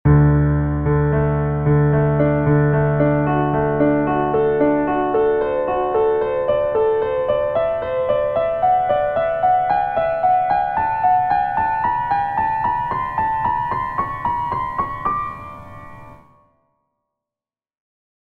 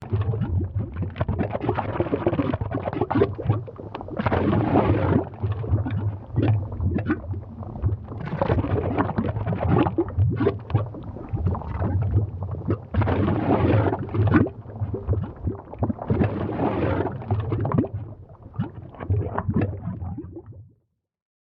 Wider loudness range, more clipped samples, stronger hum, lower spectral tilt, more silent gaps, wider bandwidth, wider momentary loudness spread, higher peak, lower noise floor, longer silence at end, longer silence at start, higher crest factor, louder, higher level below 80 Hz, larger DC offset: first, 8 LU vs 3 LU; neither; neither; about the same, -10.5 dB/octave vs -11.5 dB/octave; neither; about the same, 4.3 kHz vs 4.7 kHz; second, 6 LU vs 11 LU; about the same, -4 dBFS vs -4 dBFS; first, under -90 dBFS vs -69 dBFS; first, 2.05 s vs 0.75 s; about the same, 0.05 s vs 0 s; second, 14 dB vs 20 dB; first, -18 LUFS vs -25 LUFS; about the same, -36 dBFS vs -40 dBFS; neither